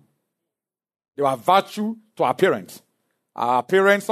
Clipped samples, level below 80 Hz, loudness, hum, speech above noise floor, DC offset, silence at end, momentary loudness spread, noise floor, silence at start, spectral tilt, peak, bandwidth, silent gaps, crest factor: under 0.1%; -74 dBFS; -21 LUFS; none; 68 dB; under 0.1%; 0 s; 11 LU; -88 dBFS; 1.2 s; -5 dB/octave; -4 dBFS; 13.5 kHz; none; 20 dB